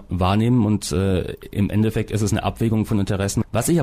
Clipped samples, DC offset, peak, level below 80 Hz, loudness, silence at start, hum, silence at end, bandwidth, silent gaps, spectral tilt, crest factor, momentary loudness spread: under 0.1%; under 0.1%; -8 dBFS; -38 dBFS; -21 LUFS; 0 s; none; 0 s; 15.5 kHz; none; -6 dB/octave; 12 dB; 5 LU